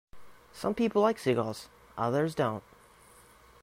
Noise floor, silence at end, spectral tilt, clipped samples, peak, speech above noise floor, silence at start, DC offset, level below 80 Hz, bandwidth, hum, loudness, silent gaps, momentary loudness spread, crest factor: -57 dBFS; 1 s; -6.5 dB/octave; under 0.1%; -12 dBFS; 28 dB; 0.15 s; under 0.1%; -64 dBFS; 16 kHz; none; -30 LUFS; none; 15 LU; 18 dB